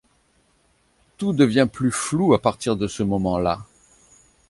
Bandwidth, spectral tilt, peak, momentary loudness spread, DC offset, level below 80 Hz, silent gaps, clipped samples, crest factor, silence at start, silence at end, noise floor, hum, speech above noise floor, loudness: 11.5 kHz; -5.5 dB/octave; -2 dBFS; 7 LU; under 0.1%; -48 dBFS; none; under 0.1%; 20 dB; 1.2 s; 0.85 s; -63 dBFS; none; 43 dB; -21 LUFS